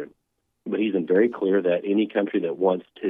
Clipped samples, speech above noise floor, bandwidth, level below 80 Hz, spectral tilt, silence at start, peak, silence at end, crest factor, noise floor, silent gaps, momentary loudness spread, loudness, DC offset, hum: under 0.1%; 53 dB; 3.8 kHz; -78 dBFS; -9.5 dB/octave; 0 s; -8 dBFS; 0 s; 16 dB; -75 dBFS; none; 8 LU; -23 LUFS; under 0.1%; none